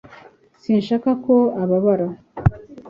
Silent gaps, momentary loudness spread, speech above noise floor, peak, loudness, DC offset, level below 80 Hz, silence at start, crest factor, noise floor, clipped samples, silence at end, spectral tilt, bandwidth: none; 6 LU; 30 dB; -2 dBFS; -19 LUFS; under 0.1%; -40 dBFS; 0.1 s; 18 dB; -48 dBFS; under 0.1%; 0 s; -10 dB/octave; 7.2 kHz